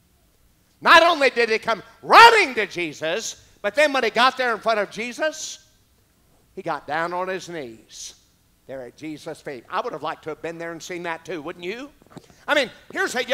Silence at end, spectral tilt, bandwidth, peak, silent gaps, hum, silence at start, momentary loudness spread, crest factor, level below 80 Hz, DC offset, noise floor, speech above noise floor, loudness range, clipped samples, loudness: 0 s; -2 dB/octave; 16 kHz; 0 dBFS; none; none; 0.8 s; 23 LU; 22 dB; -62 dBFS; under 0.1%; -60 dBFS; 38 dB; 16 LU; under 0.1%; -19 LUFS